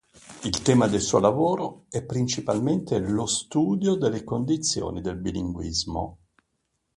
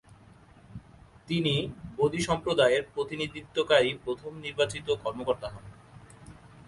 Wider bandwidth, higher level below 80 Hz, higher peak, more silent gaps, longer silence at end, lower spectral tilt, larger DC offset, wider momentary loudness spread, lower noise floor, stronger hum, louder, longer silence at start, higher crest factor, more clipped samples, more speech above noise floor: about the same, 11.5 kHz vs 11.5 kHz; first, -48 dBFS vs -56 dBFS; about the same, -6 dBFS vs -8 dBFS; neither; first, 0.8 s vs 0.05 s; about the same, -5 dB/octave vs -5 dB/octave; neither; second, 10 LU vs 18 LU; first, -76 dBFS vs -55 dBFS; neither; first, -25 LUFS vs -28 LUFS; second, 0.25 s vs 0.7 s; about the same, 20 dB vs 22 dB; neither; first, 51 dB vs 26 dB